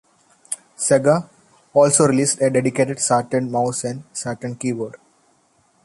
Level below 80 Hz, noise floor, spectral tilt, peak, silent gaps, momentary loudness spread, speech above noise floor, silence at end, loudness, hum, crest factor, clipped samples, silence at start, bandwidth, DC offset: -62 dBFS; -60 dBFS; -4.5 dB/octave; -2 dBFS; none; 13 LU; 42 dB; 0.9 s; -19 LUFS; none; 18 dB; under 0.1%; 0.5 s; 11.5 kHz; under 0.1%